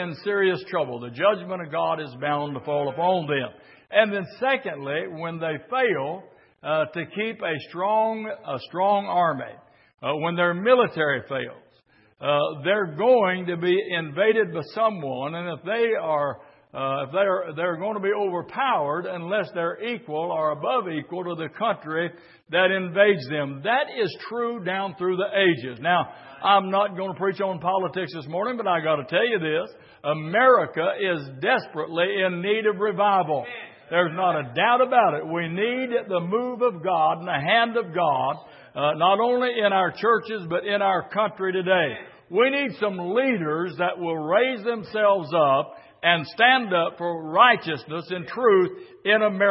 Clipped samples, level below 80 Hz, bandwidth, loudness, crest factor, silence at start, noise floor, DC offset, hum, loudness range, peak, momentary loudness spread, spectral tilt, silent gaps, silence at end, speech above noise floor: under 0.1%; -74 dBFS; 5.8 kHz; -23 LUFS; 22 dB; 0 s; -60 dBFS; under 0.1%; none; 4 LU; -2 dBFS; 10 LU; -9.5 dB/octave; none; 0 s; 37 dB